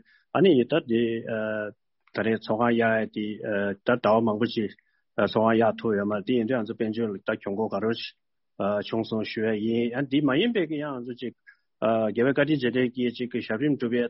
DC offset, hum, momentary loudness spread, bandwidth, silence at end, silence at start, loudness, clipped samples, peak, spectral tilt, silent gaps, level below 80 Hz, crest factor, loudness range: under 0.1%; none; 10 LU; 5.8 kHz; 0 s; 0.35 s; -26 LUFS; under 0.1%; -8 dBFS; -4.5 dB/octave; none; -66 dBFS; 18 dB; 3 LU